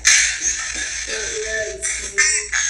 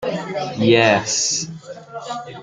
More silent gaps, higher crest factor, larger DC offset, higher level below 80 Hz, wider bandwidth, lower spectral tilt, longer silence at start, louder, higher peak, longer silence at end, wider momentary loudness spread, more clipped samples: neither; about the same, 20 dB vs 18 dB; neither; first, -42 dBFS vs -60 dBFS; first, 15 kHz vs 10 kHz; second, 1.5 dB/octave vs -3.5 dB/octave; about the same, 0 s vs 0 s; about the same, -18 LUFS vs -17 LUFS; about the same, 0 dBFS vs -2 dBFS; about the same, 0 s vs 0 s; second, 9 LU vs 19 LU; neither